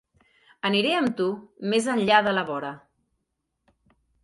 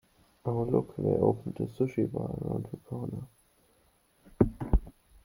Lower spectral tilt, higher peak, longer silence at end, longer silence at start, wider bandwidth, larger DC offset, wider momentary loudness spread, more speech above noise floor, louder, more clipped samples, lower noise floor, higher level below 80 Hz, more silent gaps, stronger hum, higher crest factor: second, -4.5 dB/octave vs -10.5 dB/octave; first, -4 dBFS vs -8 dBFS; first, 1.45 s vs 0.35 s; first, 0.65 s vs 0.45 s; second, 11.5 kHz vs 16.5 kHz; neither; about the same, 12 LU vs 12 LU; first, 55 dB vs 37 dB; first, -24 LUFS vs -32 LUFS; neither; first, -79 dBFS vs -67 dBFS; second, -68 dBFS vs -40 dBFS; neither; neither; about the same, 22 dB vs 24 dB